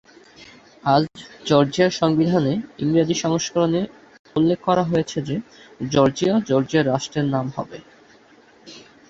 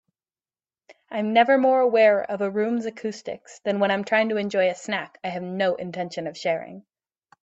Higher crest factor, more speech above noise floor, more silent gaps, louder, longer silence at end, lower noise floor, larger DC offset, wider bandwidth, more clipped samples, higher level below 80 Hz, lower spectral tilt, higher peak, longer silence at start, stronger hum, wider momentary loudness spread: about the same, 20 dB vs 18 dB; second, 31 dB vs over 67 dB; first, 4.19-4.25 s vs none; first, -20 LUFS vs -23 LUFS; second, 0.3 s vs 0.65 s; second, -51 dBFS vs under -90 dBFS; neither; about the same, 8 kHz vs 8.2 kHz; neither; first, -56 dBFS vs -72 dBFS; about the same, -6 dB/octave vs -5.5 dB/octave; first, -2 dBFS vs -6 dBFS; second, 0.4 s vs 0.9 s; neither; second, 11 LU vs 14 LU